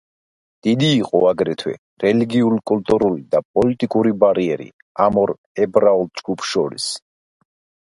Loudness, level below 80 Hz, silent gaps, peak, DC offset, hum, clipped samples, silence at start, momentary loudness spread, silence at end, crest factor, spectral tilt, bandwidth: -18 LUFS; -54 dBFS; 1.78-1.97 s, 3.45-3.54 s, 4.73-4.95 s, 5.38-5.55 s; 0 dBFS; under 0.1%; none; under 0.1%; 0.65 s; 9 LU; 0.95 s; 18 dB; -6 dB/octave; 11.5 kHz